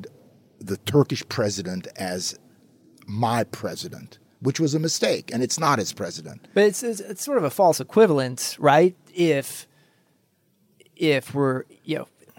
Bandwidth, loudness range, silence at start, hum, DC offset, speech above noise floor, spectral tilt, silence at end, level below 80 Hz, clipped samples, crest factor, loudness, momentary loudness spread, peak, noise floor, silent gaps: 17 kHz; 7 LU; 0 s; none; under 0.1%; 43 dB; -4.5 dB/octave; 0.35 s; -72 dBFS; under 0.1%; 18 dB; -23 LUFS; 14 LU; -4 dBFS; -66 dBFS; none